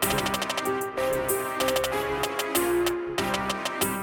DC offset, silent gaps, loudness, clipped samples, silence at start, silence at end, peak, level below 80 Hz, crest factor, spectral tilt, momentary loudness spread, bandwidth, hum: under 0.1%; none; -26 LUFS; under 0.1%; 0 s; 0 s; -10 dBFS; -50 dBFS; 18 dB; -3 dB/octave; 3 LU; 17.5 kHz; none